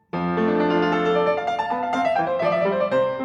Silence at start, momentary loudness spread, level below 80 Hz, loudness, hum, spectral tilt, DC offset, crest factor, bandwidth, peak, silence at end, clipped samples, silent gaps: 0.15 s; 4 LU; -58 dBFS; -21 LUFS; none; -7 dB/octave; under 0.1%; 12 dB; 9.4 kHz; -8 dBFS; 0 s; under 0.1%; none